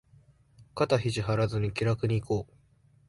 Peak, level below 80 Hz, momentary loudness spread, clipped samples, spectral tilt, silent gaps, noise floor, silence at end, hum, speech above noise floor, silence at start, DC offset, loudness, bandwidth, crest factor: -12 dBFS; -54 dBFS; 6 LU; under 0.1%; -6.5 dB/octave; none; -63 dBFS; 0.65 s; none; 35 dB; 0.6 s; under 0.1%; -29 LUFS; 11.5 kHz; 18 dB